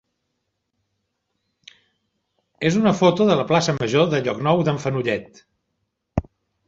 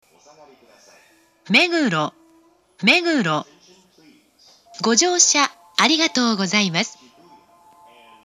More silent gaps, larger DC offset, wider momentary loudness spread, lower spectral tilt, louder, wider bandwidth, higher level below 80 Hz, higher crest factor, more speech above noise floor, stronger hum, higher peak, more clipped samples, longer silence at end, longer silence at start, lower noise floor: neither; neither; about the same, 12 LU vs 10 LU; first, -6 dB/octave vs -2 dB/octave; second, -20 LUFS vs -17 LUFS; second, 8 kHz vs 13 kHz; first, -48 dBFS vs -76 dBFS; about the same, 20 dB vs 22 dB; first, 57 dB vs 38 dB; neither; about the same, -2 dBFS vs 0 dBFS; neither; second, 0.45 s vs 1.35 s; first, 2.6 s vs 1.45 s; first, -76 dBFS vs -56 dBFS